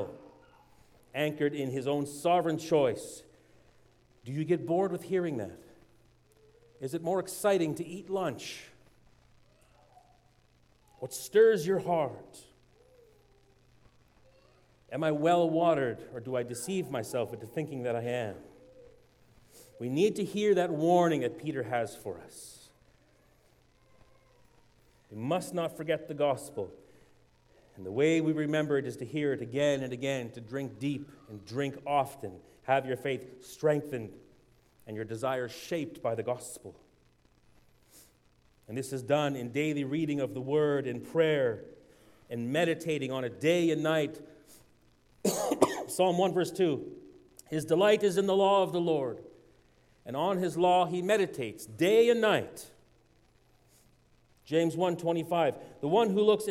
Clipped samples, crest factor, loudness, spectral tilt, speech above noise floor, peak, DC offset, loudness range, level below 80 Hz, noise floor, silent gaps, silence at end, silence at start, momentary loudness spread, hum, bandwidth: under 0.1%; 26 dB; -30 LUFS; -5.5 dB/octave; 36 dB; -6 dBFS; under 0.1%; 9 LU; -70 dBFS; -65 dBFS; none; 0 s; 0 s; 16 LU; none; 16 kHz